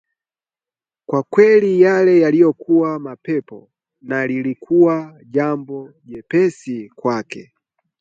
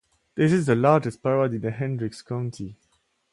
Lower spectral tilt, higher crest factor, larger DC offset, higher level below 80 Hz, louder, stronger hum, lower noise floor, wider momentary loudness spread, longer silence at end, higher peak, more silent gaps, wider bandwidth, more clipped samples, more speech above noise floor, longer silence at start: about the same, -8 dB/octave vs -7.5 dB/octave; about the same, 16 dB vs 20 dB; neither; second, -66 dBFS vs -60 dBFS; first, -16 LUFS vs -24 LUFS; neither; first, under -90 dBFS vs -69 dBFS; about the same, 17 LU vs 15 LU; about the same, 0.6 s vs 0.6 s; first, 0 dBFS vs -4 dBFS; neither; second, 7.8 kHz vs 11.5 kHz; neither; first, over 74 dB vs 46 dB; first, 1.1 s vs 0.35 s